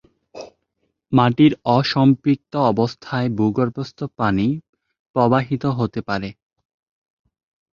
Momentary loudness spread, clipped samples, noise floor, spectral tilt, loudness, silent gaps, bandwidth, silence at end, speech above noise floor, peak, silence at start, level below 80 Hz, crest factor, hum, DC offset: 14 LU; under 0.1%; -72 dBFS; -8 dB/octave; -19 LUFS; 4.69-4.73 s, 4.99-5.14 s; 7.2 kHz; 1.4 s; 54 dB; -2 dBFS; 0.35 s; -52 dBFS; 18 dB; none; under 0.1%